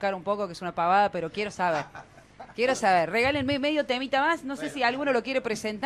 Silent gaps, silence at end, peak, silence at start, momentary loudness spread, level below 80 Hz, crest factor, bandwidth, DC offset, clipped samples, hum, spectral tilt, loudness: none; 0 s; -10 dBFS; 0 s; 9 LU; -60 dBFS; 16 dB; 14.5 kHz; under 0.1%; under 0.1%; none; -4 dB/octave; -26 LUFS